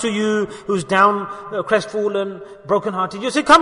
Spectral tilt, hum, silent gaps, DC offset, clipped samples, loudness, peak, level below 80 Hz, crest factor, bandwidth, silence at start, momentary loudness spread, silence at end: -4.5 dB/octave; none; none; under 0.1%; under 0.1%; -19 LUFS; 0 dBFS; -54 dBFS; 18 dB; 11 kHz; 0 s; 11 LU; 0 s